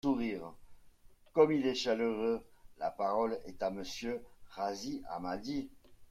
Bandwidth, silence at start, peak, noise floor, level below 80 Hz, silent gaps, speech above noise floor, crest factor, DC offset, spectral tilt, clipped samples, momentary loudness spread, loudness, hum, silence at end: 14 kHz; 0.05 s; -14 dBFS; -60 dBFS; -62 dBFS; none; 25 dB; 22 dB; under 0.1%; -5 dB/octave; under 0.1%; 12 LU; -35 LUFS; none; 0.05 s